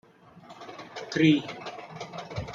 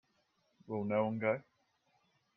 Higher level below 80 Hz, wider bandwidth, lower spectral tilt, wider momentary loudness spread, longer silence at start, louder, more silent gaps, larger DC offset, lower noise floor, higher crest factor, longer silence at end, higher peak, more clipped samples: first, -60 dBFS vs -80 dBFS; first, 7.6 kHz vs 5.8 kHz; second, -6 dB/octave vs -9.5 dB/octave; first, 21 LU vs 8 LU; second, 0.35 s vs 0.7 s; first, -27 LUFS vs -36 LUFS; neither; neither; second, -51 dBFS vs -77 dBFS; about the same, 22 dB vs 20 dB; second, 0 s vs 0.95 s; first, -8 dBFS vs -20 dBFS; neither